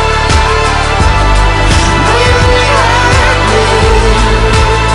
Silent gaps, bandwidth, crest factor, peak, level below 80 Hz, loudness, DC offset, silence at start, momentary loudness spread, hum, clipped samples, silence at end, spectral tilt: none; 11 kHz; 8 dB; 0 dBFS; -12 dBFS; -8 LUFS; under 0.1%; 0 s; 2 LU; none; under 0.1%; 0 s; -4.5 dB/octave